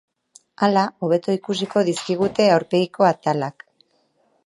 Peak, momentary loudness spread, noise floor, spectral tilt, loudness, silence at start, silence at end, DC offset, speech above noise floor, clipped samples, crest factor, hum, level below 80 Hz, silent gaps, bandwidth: -2 dBFS; 6 LU; -64 dBFS; -5.5 dB/octave; -20 LUFS; 0.6 s; 0.95 s; under 0.1%; 45 dB; under 0.1%; 18 dB; none; -64 dBFS; none; 11.5 kHz